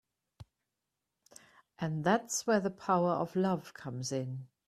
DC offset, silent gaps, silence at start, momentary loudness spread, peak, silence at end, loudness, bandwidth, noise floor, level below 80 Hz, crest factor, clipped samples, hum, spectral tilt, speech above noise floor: under 0.1%; none; 0.4 s; 10 LU; -14 dBFS; 0.25 s; -33 LUFS; 14.5 kHz; -87 dBFS; -72 dBFS; 20 dB; under 0.1%; none; -5 dB/octave; 55 dB